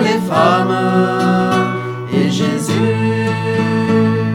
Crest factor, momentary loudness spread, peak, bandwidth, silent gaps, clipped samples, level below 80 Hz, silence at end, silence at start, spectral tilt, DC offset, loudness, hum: 14 dB; 4 LU; 0 dBFS; 16 kHz; none; under 0.1%; -58 dBFS; 0 s; 0 s; -6.5 dB/octave; under 0.1%; -15 LUFS; none